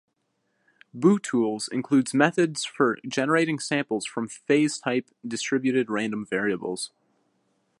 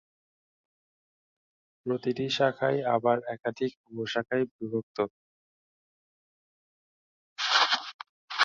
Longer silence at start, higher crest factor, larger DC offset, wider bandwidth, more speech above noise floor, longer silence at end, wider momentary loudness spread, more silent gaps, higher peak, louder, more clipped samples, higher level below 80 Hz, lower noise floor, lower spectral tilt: second, 0.95 s vs 1.85 s; about the same, 22 dB vs 24 dB; neither; first, 11.5 kHz vs 7.6 kHz; second, 50 dB vs over 61 dB; first, 0.95 s vs 0 s; second, 9 LU vs 13 LU; second, none vs 3.77-3.84 s, 4.51-4.59 s, 4.83-4.95 s, 5.10-7.36 s, 7.94-7.99 s, 8.09-8.28 s; first, -4 dBFS vs -8 dBFS; first, -25 LUFS vs -29 LUFS; neither; about the same, -74 dBFS vs -74 dBFS; second, -75 dBFS vs under -90 dBFS; about the same, -4.5 dB/octave vs -4 dB/octave